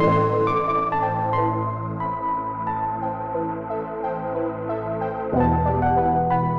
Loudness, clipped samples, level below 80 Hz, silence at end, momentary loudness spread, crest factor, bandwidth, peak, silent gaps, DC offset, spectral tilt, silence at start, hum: -23 LUFS; under 0.1%; -42 dBFS; 0 s; 7 LU; 14 dB; 6.2 kHz; -8 dBFS; none; 0.2%; -10 dB/octave; 0 s; none